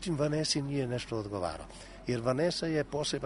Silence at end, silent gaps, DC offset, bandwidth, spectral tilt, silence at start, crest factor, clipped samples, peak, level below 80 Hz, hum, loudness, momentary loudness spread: 0 s; none; under 0.1%; 11 kHz; -5 dB/octave; 0 s; 18 dB; under 0.1%; -16 dBFS; -54 dBFS; none; -33 LUFS; 9 LU